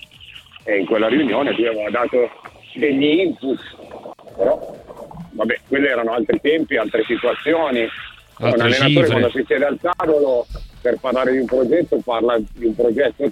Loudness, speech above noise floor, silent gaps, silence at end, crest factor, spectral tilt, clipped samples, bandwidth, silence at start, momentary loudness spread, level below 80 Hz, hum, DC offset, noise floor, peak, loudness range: -18 LUFS; 24 dB; none; 0 s; 18 dB; -6.5 dB/octave; under 0.1%; 12 kHz; 0.2 s; 19 LU; -46 dBFS; none; under 0.1%; -42 dBFS; 0 dBFS; 4 LU